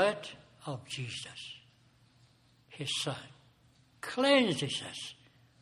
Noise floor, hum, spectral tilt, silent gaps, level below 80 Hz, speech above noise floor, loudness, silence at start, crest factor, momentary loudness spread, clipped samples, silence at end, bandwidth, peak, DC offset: -65 dBFS; none; -4 dB/octave; none; -74 dBFS; 32 dB; -33 LUFS; 0 s; 24 dB; 21 LU; under 0.1%; 0.5 s; 14 kHz; -12 dBFS; under 0.1%